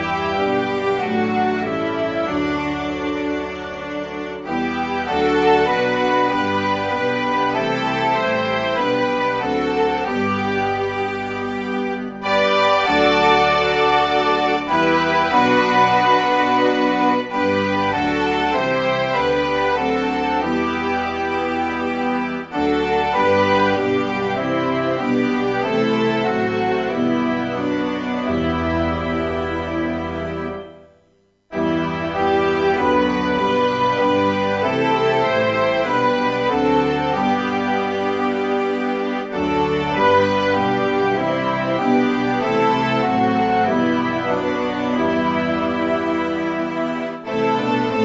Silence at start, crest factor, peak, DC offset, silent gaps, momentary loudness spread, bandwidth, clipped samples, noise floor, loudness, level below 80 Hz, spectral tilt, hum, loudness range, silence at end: 0 s; 16 dB; -2 dBFS; under 0.1%; none; 7 LU; 8 kHz; under 0.1%; -59 dBFS; -19 LUFS; -46 dBFS; -6 dB/octave; none; 5 LU; 0 s